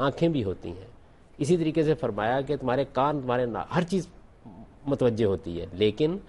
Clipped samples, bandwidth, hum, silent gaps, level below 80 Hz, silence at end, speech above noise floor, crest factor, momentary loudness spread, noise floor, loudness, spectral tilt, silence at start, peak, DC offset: under 0.1%; 11.5 kHz; none; none; -52 dBFS; 0 s; 21 dB; 16 dB; 11 LU; -48 dBFS; -27 LUFS; -7 dB/octave; 0 s; -12 dBFS; under 0.1%